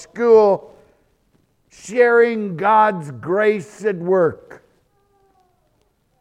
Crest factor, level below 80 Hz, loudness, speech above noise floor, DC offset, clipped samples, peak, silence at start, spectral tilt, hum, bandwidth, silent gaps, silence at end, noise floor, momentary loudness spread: 18 dB; -64 dBFS; -17 LUFS; 47 dB; under 0.1%; under 0.1%; -2 dBFS; 0 s; -6.5 dB/octave; none; 9.8 kHz; none; 1.85 s; -63 dBFS; 11 LU